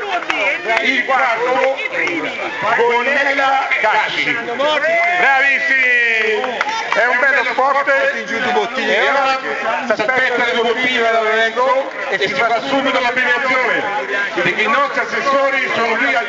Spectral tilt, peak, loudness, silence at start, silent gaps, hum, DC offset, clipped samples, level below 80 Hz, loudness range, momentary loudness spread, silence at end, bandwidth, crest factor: -2.5 dB/octave; 0 dBFS; -15 LUFS; 0 s; none; none; under 0.1%; under 0.1%; -60 dBFS; 2 LU; 6 LU; 0 s; 8 kHz; 16 dB